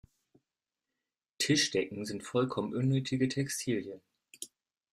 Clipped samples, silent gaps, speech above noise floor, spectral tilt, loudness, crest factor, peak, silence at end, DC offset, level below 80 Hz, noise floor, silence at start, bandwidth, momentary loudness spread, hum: under 0.1%; none; over 58 dB; -4.5 dB/octave; -32 LUFS; 18 dB; -16 dBFS; 0.45 s; under 0.1%; -70 dBFS; under -90 dBFS; 1.4 s; 15 kHz; 19 LU; none